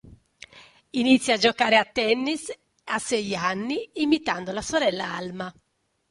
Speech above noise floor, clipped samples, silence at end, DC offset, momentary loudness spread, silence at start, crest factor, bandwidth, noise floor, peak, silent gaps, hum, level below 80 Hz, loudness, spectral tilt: 49 dB; under 0.1%; 0.6 s; under 0.1%; 13 LU; 0.05 s; 20 dB; 11.5 kHz; -73 dBFS; -6 dBFS; none; none; -60 dBFS; -24 LUFS; -3.5 dB/octave